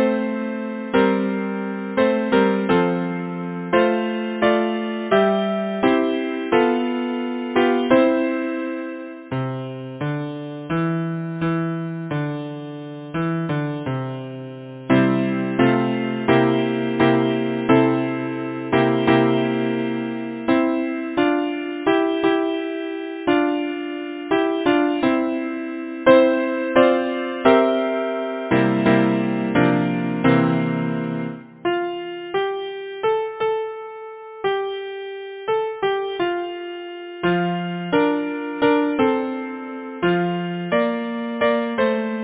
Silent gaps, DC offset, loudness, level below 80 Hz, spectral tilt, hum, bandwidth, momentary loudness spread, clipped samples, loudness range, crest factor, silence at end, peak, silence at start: none; under 0.1%; -21 LUFS; -56 dBFS; -10.5 dB/octave; none; 4 kHz; 12 LU; under 0.1%; 7 LU; 20 dB; 0 s; 0 dBFS; 0 s